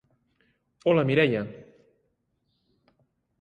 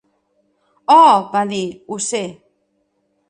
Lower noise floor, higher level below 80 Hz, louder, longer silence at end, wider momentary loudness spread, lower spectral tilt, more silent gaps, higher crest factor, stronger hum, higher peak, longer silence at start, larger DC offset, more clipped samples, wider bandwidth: first, -75 dBFS vs -66 dBFS; about the same, -66 dBFS vs -66 dBFS; second, -24 LUFS vs -15 LUFS; first, 1.8 s vs 1 s; second, 11 LU vs 17 LU; first, -8 dB/octave vs -3.5 dB/octave; neither; about the same, 20 dB vs 16 dB; neither; second, -10 dBFS vs 0 dBFS; about the same, 0.85 s vs 0.9 s; neither; neither; second, 8.8 kHz vs 10 kHz